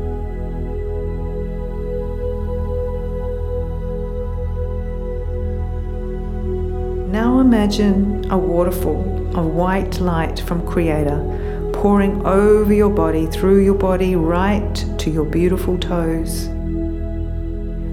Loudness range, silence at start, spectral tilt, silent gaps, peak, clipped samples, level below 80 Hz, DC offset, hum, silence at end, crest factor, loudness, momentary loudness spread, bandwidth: 9 LU; 0 s; -7.5 dB/octave; none; -2 dBFS; under 0.1%; -24 dBFS; under 0.1%; none; 0 s; 16 dB; -19 LUFS; 12 LU; 15.5 kHz